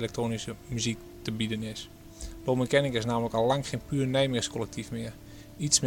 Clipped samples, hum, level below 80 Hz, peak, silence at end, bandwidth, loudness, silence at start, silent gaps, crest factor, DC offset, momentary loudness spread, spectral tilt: under 0.1%; none; -50 dBFS; -6 dBFS; 0 s; 17 kHz; -30 LUFS; 0 s; none; 24 dB; under 0.1%; 16 LU; -4 dB/octave